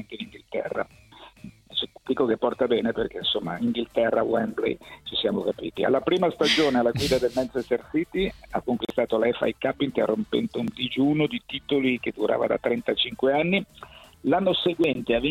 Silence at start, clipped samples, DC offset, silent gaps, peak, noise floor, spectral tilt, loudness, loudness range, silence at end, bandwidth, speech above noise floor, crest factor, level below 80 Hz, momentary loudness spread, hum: 0 s; under 0.1%; under 0.1%; none; -8 dBFS; -50 dBFS; -5.5 dB/octave; -25 LUFS; 2 LU; 0 s; 16 kHz; 25 dB; 18 dB; -52 dBFS; 8 LU; none